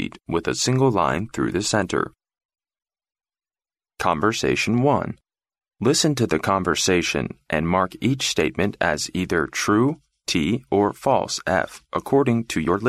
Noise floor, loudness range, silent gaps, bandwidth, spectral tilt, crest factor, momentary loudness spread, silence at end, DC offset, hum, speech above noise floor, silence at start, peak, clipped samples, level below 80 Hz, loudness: under -90 dBFS; 4 LU; 2.45-2.49 s; 15 kHz; -4.5 dB/octave; 18 dB; 7 LU; 0 s; under 0.1%; none; over 69 dB; 0 s; -4 dBFS; under 0.1%; -48 dBFS; -22 LUFS